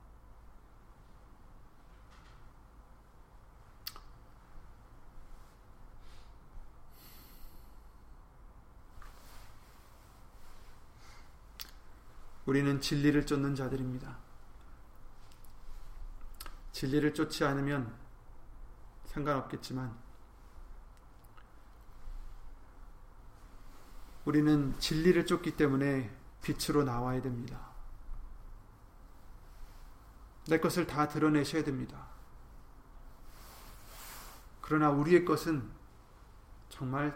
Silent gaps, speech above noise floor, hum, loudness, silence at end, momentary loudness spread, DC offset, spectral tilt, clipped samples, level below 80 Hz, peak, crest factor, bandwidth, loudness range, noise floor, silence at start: none; 25 dB; none; -32 LUFS; 0 s; 28 LU; under 0.1%; -6 dB/octave; under 0.1%; -50 dBFS; -14 dBFS; 24 dB; 16.5 kHz; 22 LU; -57 dBFS; 0 s